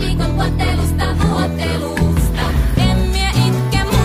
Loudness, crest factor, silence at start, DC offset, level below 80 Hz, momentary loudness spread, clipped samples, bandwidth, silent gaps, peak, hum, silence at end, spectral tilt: -16 LUFS; 14 dB; 0 s; under 0.1%; -20 dBFS; 3 LU; under 0.1%; 15.5 kHz; none; -2 dBFS; none; 0 s; -6 dB/octave